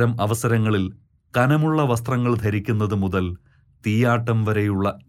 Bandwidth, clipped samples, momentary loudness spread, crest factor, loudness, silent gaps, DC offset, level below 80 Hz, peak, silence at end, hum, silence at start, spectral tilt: 15 kHz; under 0.1%; 7 LU; 14 dB; -21 LUFS; none; under 0.1%; -50 dBFS; -6 dBFS; 0.1 s; none; 0 s; -7 dB/octave